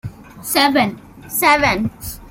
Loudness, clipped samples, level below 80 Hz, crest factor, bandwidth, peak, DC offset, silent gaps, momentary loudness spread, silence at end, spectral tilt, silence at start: -16 LUFS; under 0.1%; -42 dBFS; 18 dB; 17 kHz; 0 dBFS; under 0.1%; none; 18 LU; 0 s; -3.5 dB/octave; 0.05 s